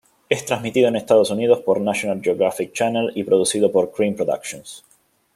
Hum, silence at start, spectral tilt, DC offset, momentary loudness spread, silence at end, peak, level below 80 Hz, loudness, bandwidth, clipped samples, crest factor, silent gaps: none; 0.3 s; -4.5 dB/octave; under 0.1%; 7 LU; 0.55 s; -2 dBFS; -64 dBFS; -19 LUFS; 15 kHz; under 0.1%; 18 dB; none